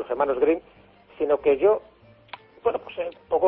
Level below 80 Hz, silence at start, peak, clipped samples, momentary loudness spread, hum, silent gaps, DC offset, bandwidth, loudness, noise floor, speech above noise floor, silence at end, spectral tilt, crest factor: -58 dBFS; 0 s; -8 dBFS; under 0.1%; 18 LU; none; none; under 0.1%; 4.5 kHz; -24 LUFS; -46 dBFS; 23 dB; 0 s; -9 dB/octave; 16 dB